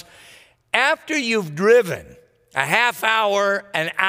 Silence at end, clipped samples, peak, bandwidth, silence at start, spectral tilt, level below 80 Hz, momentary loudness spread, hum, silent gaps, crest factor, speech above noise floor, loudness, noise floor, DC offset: 0 s; under 0.1%; 0 dBFS; 16 kHz; 0.75 s; -3.5 dB/octave; -62 dBFS; 8 LU; none; none; 20 dB; 30 dB; -19 LUFS; -49 dBFS; under 0.1%